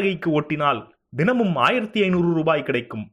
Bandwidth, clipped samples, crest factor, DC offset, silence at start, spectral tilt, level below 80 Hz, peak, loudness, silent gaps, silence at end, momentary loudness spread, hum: 10.5 kHz; under 0.1%; 18 dB; under 0.1%; 0 s; -7.5 dB/octave; -58 dBFS; -4 dBFS; -21 LUFS; none; 0.05 s; 7 LU; none